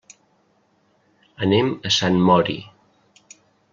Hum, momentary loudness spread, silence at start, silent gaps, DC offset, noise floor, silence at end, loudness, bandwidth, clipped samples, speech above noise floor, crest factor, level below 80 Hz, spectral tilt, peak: none; 10 LU; 1.4 s; none; under 0.1%; -62 dBFS; 1.1 s; -19 LUFS; 7.4 kHz; under 0.1%; 44 dB; 20 dB; -58 dBFS; -5 dB/octave; -2 dBFS